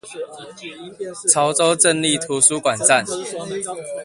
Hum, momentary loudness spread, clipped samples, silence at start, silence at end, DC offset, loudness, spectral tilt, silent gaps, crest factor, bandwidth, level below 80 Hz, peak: none; 19 LU; under 0.1%; 0.05 s; 0 s; under 0.1%; -17 LUFS; -2 dB/octave; none; 20 dB; 11.5 kHz; -62 dBFS; 0 dBFS